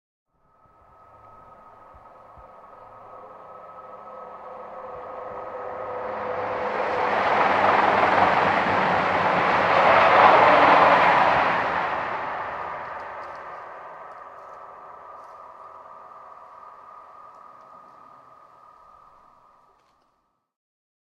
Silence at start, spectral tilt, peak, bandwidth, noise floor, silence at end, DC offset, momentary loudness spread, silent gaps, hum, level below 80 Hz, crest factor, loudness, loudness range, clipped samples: 2.35 s; -5 dB/octave; -2 dBFS; 9.4 kHz; -71 dBFS; 4.15 s; under 0.1%; 28 LU; none; none; -62 dBFS; 22 dB; -20 LUFS; 25 LU; under 0.1%